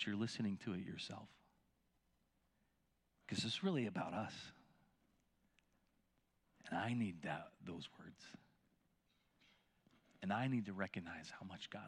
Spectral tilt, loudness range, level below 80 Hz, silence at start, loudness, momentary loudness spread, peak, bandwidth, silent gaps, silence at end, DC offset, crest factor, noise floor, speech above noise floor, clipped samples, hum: -5.5 dB/octave; 4 LU; -84 dBFS; 0 s; -45 LUFS; 19 LU; -26 dBFS; 11.5 kHz; none; 0 s; under 0.1%; 20 dB; -82 dBFS; 38 dB; under 0.1%; none